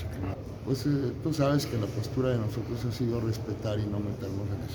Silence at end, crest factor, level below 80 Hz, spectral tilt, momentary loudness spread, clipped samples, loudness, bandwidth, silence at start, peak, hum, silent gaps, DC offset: 0 s; 16 dB; -48 dBFS; -7 dB/octave; 7 LU; under 0.1%; -31 LUFS; over 20 kHz; 0 s; -14 dBFS; none; none; under 0.1%